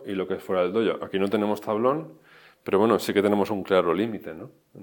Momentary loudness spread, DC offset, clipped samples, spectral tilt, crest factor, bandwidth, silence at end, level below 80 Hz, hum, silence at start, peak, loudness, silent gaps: 17 LU; under 0.1%; under 0.1%; -6 dB/octave; 20 dB; 17.5 kHz; 0 s; -68 dBFS; none; 0 s; -6 dBFS; -24 LUFS; none